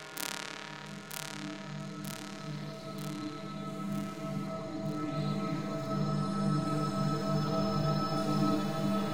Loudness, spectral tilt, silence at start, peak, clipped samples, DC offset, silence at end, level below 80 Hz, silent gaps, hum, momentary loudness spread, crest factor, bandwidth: -35 LUFS; -6 dB/octave; 0 s; -10 dBFS; under 0.1%; 0.2%; 0 s; -62 dBFS; none; none; 10 LU; 24 dB; 17 kHz